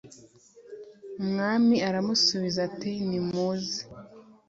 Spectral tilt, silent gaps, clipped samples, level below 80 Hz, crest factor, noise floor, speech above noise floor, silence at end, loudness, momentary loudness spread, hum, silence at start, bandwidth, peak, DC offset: -4.5 dB/octave; none; under 0.1%; -66 dBFS; 18 dB; -54 dBFS; 28 dB; 0.3 s; -27 LUFS; 23 LU; none; 0.05 s; 7.8 kHz; -12 dBFS; under 0.1%